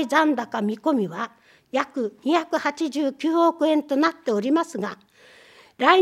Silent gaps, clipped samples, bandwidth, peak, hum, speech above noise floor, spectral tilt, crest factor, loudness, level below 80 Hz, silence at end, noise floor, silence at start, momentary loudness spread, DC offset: none; under 0.1%; 13 kHz; 0 dBFS; none; 28 dB; -5 dB/octave; 22 dB; -23 LUFS; -76 dBFS; 0 s; -51 dBFS; 0 s; 9 LU; under 0.1%